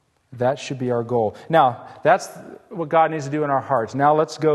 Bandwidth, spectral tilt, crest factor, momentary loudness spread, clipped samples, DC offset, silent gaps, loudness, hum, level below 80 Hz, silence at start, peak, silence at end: 12.5 kHz; -6 dB/octave; 18 dB; 8 LU; under 0.1%; under 0.1%; none; -20 LUFS; none; -64 dBFS; 0.3 s; -2 dBFS; 0 s